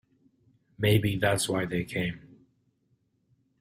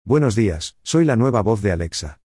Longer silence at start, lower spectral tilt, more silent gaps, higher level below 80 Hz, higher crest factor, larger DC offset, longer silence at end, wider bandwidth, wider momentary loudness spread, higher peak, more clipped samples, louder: first, 0.8 s vs 0.05 s; about the same, -5 dB/octave vs -6 dB/octave; neither; second, -56 dBFS vs -42 dBFS; first, 20 dB vs 12 dB; neither; first, 1.35 s vs 0.1 s; first, 16 kHz vs 12 kHz; about the same, 9 LU vs 8 LU; second, -12 dBFS vs -6 dBFS; neither; second, -28 LUFS vs -19 LUFS